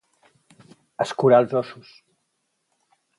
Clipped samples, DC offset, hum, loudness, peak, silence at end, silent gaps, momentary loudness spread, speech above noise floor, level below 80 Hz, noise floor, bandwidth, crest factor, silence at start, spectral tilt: under 0.1%; under 0.1%; none; -20 LUFS; -4 dBFS; 1.45 s; none; 19 LU; 54 dB; -72 dBFS; -74 dBFS; 11.5 kHz; 20 dB; 1 s; -6.5 dB/octave